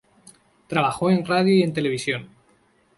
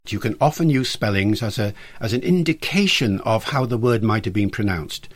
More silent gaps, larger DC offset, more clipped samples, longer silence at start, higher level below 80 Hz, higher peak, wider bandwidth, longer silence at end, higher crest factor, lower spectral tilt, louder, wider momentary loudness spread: neither; neither; neither; first, 0.7 s vs 0.05 s; second, -62 dBFS vs -46 dBFS; about the same, -6 dBFS vs -4 dBFS; second, 11.5 kHz vs 16.5 kHz; first, 0.7 s vs 0.05 s; about the same, 18 dB vs 16 dB; about the same, -6 dB/octave vs -5.5 dB/octave; about the same, -22 LUFS vs -20 LUFS; about the same, 8 LU vs 8 LU